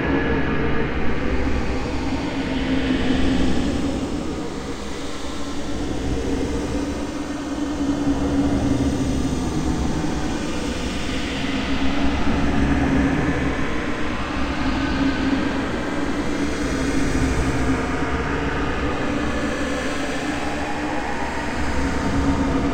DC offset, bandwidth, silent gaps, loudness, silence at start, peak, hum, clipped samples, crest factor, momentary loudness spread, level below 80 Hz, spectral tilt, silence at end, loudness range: under 0.1%; 15.5 kHz; none; -23 LUFS; 0 s; -6 dBFS; none; under 0.1%; 16 dB; 6 LU; -30 dBFS; -5.5 dB/octave; 0 s; 3 LU